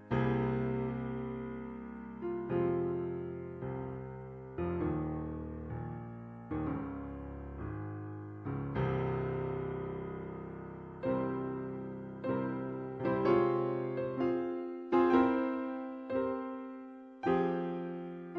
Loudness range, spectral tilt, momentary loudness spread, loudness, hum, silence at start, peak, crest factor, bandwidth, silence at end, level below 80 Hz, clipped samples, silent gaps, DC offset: 8 LU; -10 dB/octave; 13 LU; -36 LUFS; none; 0 s; -16 dBFS; 20 dB; 5.6 kHz; 0 s; -56 dBFS; under 0.1%; none; under 0.1%